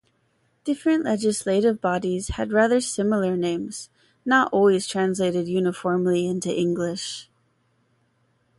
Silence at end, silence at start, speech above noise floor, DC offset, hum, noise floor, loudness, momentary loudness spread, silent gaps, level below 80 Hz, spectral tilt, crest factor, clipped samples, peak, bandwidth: 1.35 s; 0.65 s; 45 dB; under 0.1%; none; -67 dBFS; -23 LUFS; 11 LU; none; -50 dBFS; -5 dB/octave; 16 dB; under 0.1%; -6 dBFS; 11.5 kHz